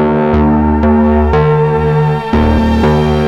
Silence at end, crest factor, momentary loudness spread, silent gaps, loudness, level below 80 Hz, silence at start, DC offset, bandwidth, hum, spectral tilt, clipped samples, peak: 0 s; 8 dB; 2 LU; none; -11 LUFS; -18 dBFS; 0 s; under 0.1%; 7.6 kHz; none; -9 dB/octave; under 0.1%; 0 dBFS